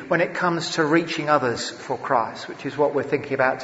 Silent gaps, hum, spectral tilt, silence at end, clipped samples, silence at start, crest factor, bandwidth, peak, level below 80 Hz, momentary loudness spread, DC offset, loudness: none; none; -4.5 dB/octave; 0 s; under 0.1%; 0 s; 18 dB; 8 kHz; -4 dBFS; -62 dBFS; 9 LU; under 0.1%; -23 LUFS